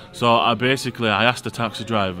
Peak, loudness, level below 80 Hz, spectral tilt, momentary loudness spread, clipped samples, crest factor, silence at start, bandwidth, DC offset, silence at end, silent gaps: 0 dBFS; -20 LUFS; -56 dBFS; -4.5 dB/octave; 8 LU; under 0.1%; 20 dB; 0 s; 16 kHz; under 0.1%; 0 s; none